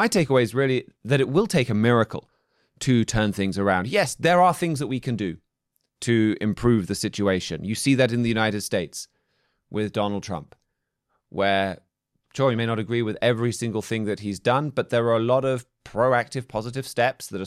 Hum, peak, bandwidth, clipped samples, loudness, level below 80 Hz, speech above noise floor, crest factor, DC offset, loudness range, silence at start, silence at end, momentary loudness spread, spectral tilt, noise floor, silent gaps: none; -8 dBFS; 14.5 kHz; under 0.1%; -23 LUFS; -50 dBFS; 55 dB; 16 dB; under 0.1%; 5 LU; 0 s; 0 s; 10 LU; -5.5 dB/octave; -78 dBFS; none